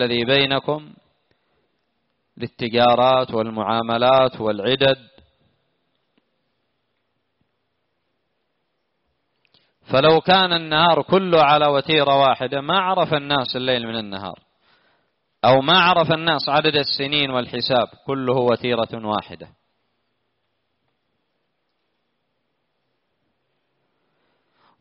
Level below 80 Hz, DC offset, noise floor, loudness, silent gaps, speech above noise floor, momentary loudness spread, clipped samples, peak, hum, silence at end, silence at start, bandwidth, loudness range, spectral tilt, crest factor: -58 dBFS; under 0.1%; -73 dBFS; -18 LUFS; none; 55 dB; 11 LU; under 0.1%; -2 dBFS; none; 5.35 s; 0 s; 5.8 kHz; 9 LU; -2.5 dB/octave; 18 dB